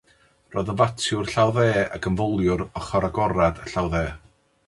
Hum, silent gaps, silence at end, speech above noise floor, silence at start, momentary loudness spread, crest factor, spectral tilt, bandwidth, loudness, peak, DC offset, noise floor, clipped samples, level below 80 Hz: none; none; 0.5 s; 37 dB; 0.5 s; 7 LU; 18 dB; -6 dB/octave; 11.5 kHz; -23 LUFS; -6 dBFS; under 0.1%; -59 dBFS; under 0.1%; -40 dBFS